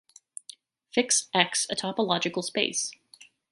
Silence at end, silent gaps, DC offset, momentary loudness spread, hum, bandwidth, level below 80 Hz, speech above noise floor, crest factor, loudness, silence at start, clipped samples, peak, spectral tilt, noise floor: 0.25 s; none; under 0.1%; 19 LU; none; 11.5 kHz; -74 dBFS; 29 dB; 26 dB; -26 LUFS; 0.95 s; under 0.1%; -4 dBFS; -2 dB/octave; -56 dBFS